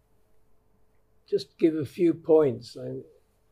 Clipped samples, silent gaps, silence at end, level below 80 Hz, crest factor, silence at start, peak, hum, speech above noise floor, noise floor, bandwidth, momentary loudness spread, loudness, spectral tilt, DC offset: under 0.1%; none; 0.5 s; -68 dBFS; 18 dB; 1.3 s; -10 dBFS; none; 37 dB; -62 dBFS; 12 kHz; 16 LU; -26 LUFS; -7.5 dB/octave; under 0.1%